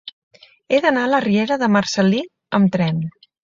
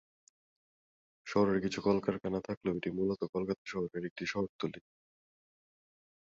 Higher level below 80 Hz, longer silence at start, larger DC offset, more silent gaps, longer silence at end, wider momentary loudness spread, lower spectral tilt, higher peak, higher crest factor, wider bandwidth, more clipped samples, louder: first, -58 dBFS vs -66 dBFS; second, 0.05 s vs 1.25 s; neither; second, 0.13-0.31 s vs 2.57-2.61 s, 3.29-3.33 s, 3.58-3.65 s, 4.11-4.16 s, 4.49-4.59 s; second, 0.35 s vs 1.4 s; about the same, 8 LU vs 8 LU; about the same, -6 dB/octave vs -6.5 dB/octave; first, -2 dBFS vs -16 dBFS; second, 16 dB vs 22 dB; about the same, 7.6 kHz vs 7.8 kHz; neither; first, -18 LUFS vs -35 LUFS